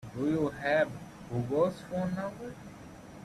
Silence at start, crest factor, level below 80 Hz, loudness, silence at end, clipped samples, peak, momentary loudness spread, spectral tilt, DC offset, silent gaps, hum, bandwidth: 0 s; 16 dB; -60 dBFS; -32 LUFS; 0 s; under 0.1%; -16 dBFS; 19 LU; -7 dB/octave; under 0.1%; none; none; 14 kHz